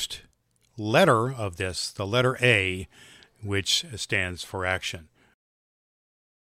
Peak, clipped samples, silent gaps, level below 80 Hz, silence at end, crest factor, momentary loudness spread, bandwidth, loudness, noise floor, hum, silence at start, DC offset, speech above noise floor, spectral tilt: -4 dBFS; under 0.1%; none; -56 dBFS; 1.55 s; 24 dB; 15 LU; 16 kHz; -25 LUFS; -67 dBFS; none; 0 s; under 0.1%; 41 dB; -4 dB/octave